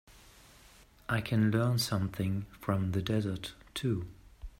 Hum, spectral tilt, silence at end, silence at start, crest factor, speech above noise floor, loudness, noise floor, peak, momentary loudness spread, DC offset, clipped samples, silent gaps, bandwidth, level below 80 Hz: none; -6 dB/octave; 0.1 s; 0.1 s; 18 dB; 27 dB; -33 LUFS; -59 dBFS; -16 dBFS; 12 LU; under 0.1%; under 0.1%; none; 16 kHz; -56 dBFS